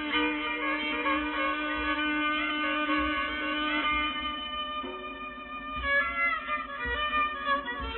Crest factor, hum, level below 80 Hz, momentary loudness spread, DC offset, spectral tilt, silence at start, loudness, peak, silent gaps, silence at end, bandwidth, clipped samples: 14 dB; none; -48 dBFS; 8 LU; under 0.1%; -0.5 dB/octave; 0 s; -29 LUFS; -16 dBFS; none; 0 s; 4.2 kHz; under 0.1%